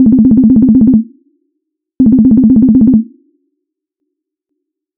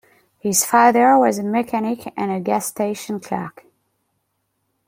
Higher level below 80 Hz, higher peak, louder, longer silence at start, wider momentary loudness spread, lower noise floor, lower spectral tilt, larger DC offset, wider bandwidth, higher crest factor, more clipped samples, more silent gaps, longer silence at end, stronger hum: first, -34 dBFS vs -66 dBFS; about the same, 0 dBFS vs -2 dBFS; first, -7 LUFS vs -18 LUFS; second, 0 s vs 0.45 s; second, 7 LU vs 14 LU; about the same, -73 dBFS vs -72 dBFS; first, -16.5 dB/octave vs -4 dB/octave; neither; second, 1.3 kHz vs 16.5 kHz; second, 10 dB vs 18 dB; neither; neither; first, 1.95 s vs 1.4 s; neither